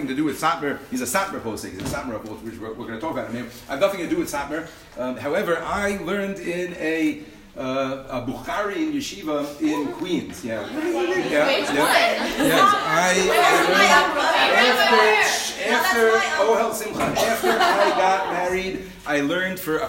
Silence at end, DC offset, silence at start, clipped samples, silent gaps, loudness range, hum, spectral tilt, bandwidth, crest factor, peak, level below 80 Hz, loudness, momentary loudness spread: 0 s; under 0.1%; 0 s; under 0.1%; none; 11 LU; none; -3 dB/octave; 16.5 kHz; 20 dB; -2 dBFS; -52 dBFS; -21 LUFS; 15 LU